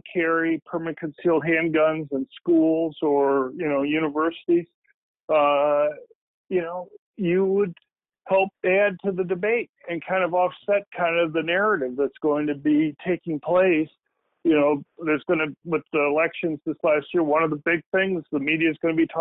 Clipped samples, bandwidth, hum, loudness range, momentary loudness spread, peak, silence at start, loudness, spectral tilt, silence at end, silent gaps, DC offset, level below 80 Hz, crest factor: under 0.1%; 4 kHz; none; 2 LU; 8 LU; -10 dBFS; 0.05 s; -23 LUFS; -10 dB/octave; 0 s; 4.74-4.82 s, 4.94-5.15 s, 5.23-5.28 s, 6.15-6.45 s, 6.98-7.14 s, 9.69-9.73 s, 10.87-10.91 s, 17.86-17.92 s; under 0.1%; -66 dBFS; 14 dB